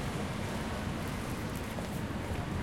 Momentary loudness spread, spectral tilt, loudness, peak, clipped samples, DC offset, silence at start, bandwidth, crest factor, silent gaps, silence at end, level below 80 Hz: 1 LU; -5.5 dB/octave; -37 LUFS; -22 dBFS; under 0.1%; 0.1%; 0 s; 17 kHz; 14 dB; none; 0 s; -46 dBFS